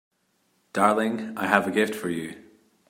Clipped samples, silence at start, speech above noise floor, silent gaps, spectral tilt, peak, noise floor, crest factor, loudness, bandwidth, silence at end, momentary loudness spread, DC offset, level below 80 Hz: under 0.1%; 0.75 s; 45 dB; none; -5 dB/octave; -2 dBFS; -70 dBFS; 24 dB; -25 LUFS; 16 kHz; 0.5 s; 12 LU; under 0.1%; -72 dBFS